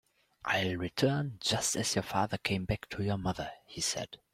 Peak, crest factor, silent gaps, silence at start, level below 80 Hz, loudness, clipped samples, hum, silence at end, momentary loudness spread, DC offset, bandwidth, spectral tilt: -14 dBFS; 20 dB; none; 0.45 s; -56 dBFS; -33 LUFS; under 0.1%; none; 0.2 s; 7 LU; under 0.1%; 16 kHz; -3.5 dB/octave